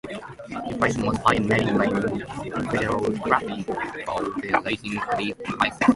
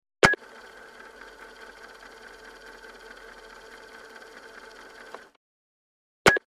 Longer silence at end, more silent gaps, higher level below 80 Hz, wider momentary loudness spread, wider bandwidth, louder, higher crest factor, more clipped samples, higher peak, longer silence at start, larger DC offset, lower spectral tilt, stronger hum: about the same, 0 s vs 0.1 s; second, none vs 5.36-6.25 s; first, -48 dBFS vs -56 dBFS; second, 10 LU vs 25 LU; second, 11.5 kHz vs 15 kHz; about the same, -24 LUFS vs -22 LUFS; second, 22 dB vs 28 dB; neither; about the same, -2 dBFS vs -2 dBFS; second, 0.05 s vs 0.25 s; neither; first, -5.5 dB/octave vs -3 dB/octave; neither